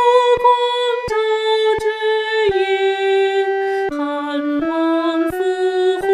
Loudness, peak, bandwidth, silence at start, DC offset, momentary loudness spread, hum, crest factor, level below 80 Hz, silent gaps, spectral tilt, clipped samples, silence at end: -17 LUFS; -2 dBFS; 13.5 kHz; 0 s; under 0.1%; 6 LU; none; 14 dB; -50 dBFS; none; -4 dB/octave; under 0.1%; 0 s